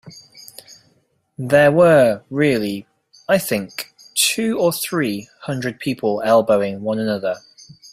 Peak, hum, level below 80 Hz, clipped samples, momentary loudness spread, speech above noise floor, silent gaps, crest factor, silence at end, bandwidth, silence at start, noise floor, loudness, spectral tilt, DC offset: -2 dBFS; none; -58 dBFS; under 0.1%; 19 LU; 45 dB; none; 18 dB; 0.05 s; 16 kHz; 0.05 s; -63 dBFS; -18 LUFS; -4.5 dB/octave; under 0.1%